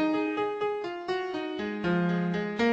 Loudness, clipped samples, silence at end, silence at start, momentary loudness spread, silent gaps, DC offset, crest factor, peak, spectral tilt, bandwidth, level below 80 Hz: -30 LUFS; under 0.1%; 0 s; 0 s; 6 LU; none; under 0.1%; 14 dB; -16 dBFS; -7.5 dB/octave; 7.8 kHz; -62 dBFS